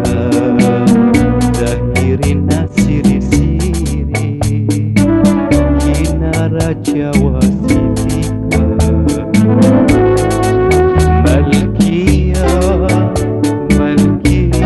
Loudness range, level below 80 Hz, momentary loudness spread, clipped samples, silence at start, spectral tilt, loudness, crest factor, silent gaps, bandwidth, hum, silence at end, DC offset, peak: 3 LU; -20 dBFS; 5 LU; under 0.1%; 0 s; -7 dB/octave; -12 LUFS; 10 dB; none; 12.5 kHz; none; 0 s; under 0.1%; 0 dBFS